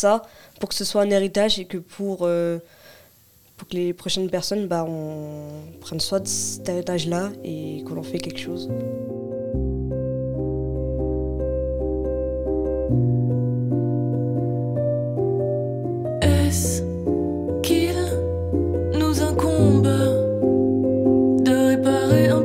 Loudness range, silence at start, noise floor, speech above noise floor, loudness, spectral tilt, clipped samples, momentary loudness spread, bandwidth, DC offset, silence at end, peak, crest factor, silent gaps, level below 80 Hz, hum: 8 LU; 0 s; -54 dBFS; 30 dB; -22 LUFS; -6 dB/octave; under 0.1%; 12 LU; 16.5 kHz; under 0.1%; 0 s; -4 dBFS; 18 dB; none; -36 dBFS; none